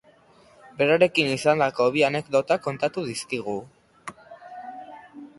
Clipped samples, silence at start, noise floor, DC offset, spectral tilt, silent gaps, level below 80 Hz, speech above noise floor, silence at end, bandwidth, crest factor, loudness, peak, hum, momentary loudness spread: under 0.1%; 0.8 s; -55 dBFS; under 0.1%; -4.5 dB/octave; none; -66 dBFS; 33 dB; 0.15 s; 11.5 kHz; 22 dB; -23 LUFS; -4 dBFS; none; 22 LU